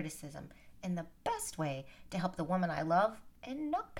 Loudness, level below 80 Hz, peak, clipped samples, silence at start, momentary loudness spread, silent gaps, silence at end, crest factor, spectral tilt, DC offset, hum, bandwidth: -37 LUFS; -62 dBFS; -20 dBFS; under 0.1%; 0 s; 16 LU; none; 0 s; 18 dB; -5.5 dB/octave; under 0.1%; none; 17.5 kHz